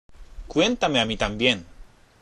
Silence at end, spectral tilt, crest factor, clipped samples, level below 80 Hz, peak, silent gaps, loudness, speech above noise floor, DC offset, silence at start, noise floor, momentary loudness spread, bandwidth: 0.35 s; -4 dB/octave; 22 dB; under 0.1%; -42 dBFS; -2 dBFS; none; -23 LUFS; 25 dB; under 0.1%; 0.1 s; -47 dBFS; 6 LU; 11 kHz